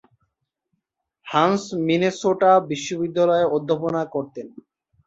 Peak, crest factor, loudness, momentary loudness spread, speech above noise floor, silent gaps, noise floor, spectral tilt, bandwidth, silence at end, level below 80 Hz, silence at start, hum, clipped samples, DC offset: -4 dBFS; 18 dB; -21 LUFS; 12 LU; 57 dB; none; -77 dBFS; -5.5 dB/octave; 8 kHz; 0.45 s; -64 dBFS; 1.25 s; none; under 0.1%; under 0.1%